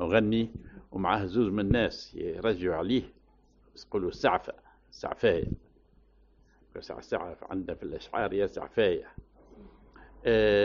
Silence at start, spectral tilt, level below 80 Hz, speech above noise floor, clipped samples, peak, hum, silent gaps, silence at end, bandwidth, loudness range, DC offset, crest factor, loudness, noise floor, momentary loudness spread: 0 s; -4.5 dB/octave; -50 dBFS; 33 dB; under 0.1%; -10 dBFS; none; none; 0 s; 7.2 kHz; 5 LU; under 0.1%; 20 dB; -30 LUFS; -62 dBFS; 16 LU